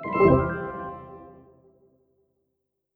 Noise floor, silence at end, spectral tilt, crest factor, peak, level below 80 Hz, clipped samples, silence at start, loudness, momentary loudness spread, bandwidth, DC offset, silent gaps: -79 dBFS; 1.65 s; -11 dB/octave; 22 dB; -4 dBFS; -46 dBFS; under 0.1%; 0 s; -23 LUFS; 25 LU; 4.6 kHz; under 0.1%; none